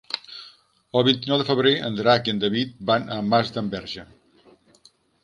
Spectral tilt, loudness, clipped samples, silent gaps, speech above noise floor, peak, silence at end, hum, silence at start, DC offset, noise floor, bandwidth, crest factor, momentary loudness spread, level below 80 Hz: -6 dB/octave; -22 LUFS; under 0.1%; none; 36 dB; -2 dBFS; 1.2 s; none; 0.1 s; under 0.1%; -58 dBFS; 11 kHz; 22 dB; 13 LU; -60 dBFS